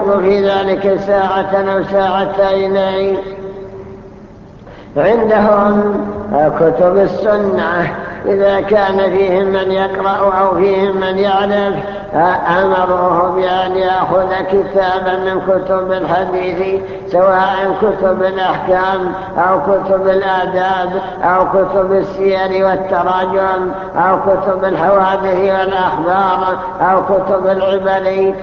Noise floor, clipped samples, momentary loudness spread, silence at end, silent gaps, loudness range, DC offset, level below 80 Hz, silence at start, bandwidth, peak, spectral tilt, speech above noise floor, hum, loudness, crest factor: -35 dBFS; under 0.1%; 6 LU; 0 s; none; 2 LU; under 0.1%; -42 dBFS; 0 s; 6.6 kHz; 0 dBFS; -7.5 dB/octave; 22 dB; none; -13 LUFS; 14 dB